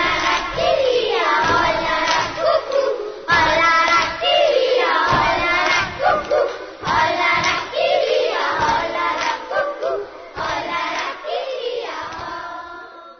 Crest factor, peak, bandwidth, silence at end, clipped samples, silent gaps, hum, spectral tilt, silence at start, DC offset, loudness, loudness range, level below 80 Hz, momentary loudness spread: 14 dB; -4 dBFS; 6.6 kHz; 0.05 s; under 0.1%; none; none; -3 dB/octave; 0 s; under 0.1%; -18 LUFS; 8 LU; -44 dBFS; 12 LU